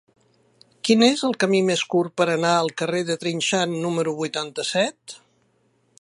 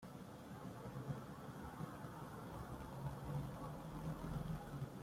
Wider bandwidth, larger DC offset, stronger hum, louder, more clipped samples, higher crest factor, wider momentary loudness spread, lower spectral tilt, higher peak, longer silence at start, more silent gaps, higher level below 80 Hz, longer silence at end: second, 11.5 kHz vs 16.5 kHz; neither; neither; first, -22 LUFS vs -50 LUFS; neither; about the same, 20 dB vs 16 dB; first, 9 LU vs 6 LU; second, -4 dB/octave vs -7 dB/octave; first, -2 dBFS vs -34 dBFS; first, 0.85 s vs 0 s; neither; second, -72 dBFS vs -60 dBFS; first, 0.85 s vs 0 s